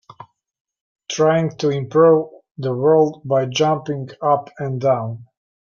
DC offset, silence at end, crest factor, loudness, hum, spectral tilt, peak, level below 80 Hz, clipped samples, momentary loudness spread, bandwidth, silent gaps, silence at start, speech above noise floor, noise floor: under 0.1%; 0.35 s; 16 dB; -18 LUFS; none; -6 dB/octave; -2 dBFS; -64 dBFS; under 0.1%; 13 LU; 7.2 kHz; 0.60-0.65 s, 0.81-0.95 s, 2.51-2.55 s; 0.2 s; 27 dB; -45 dBFS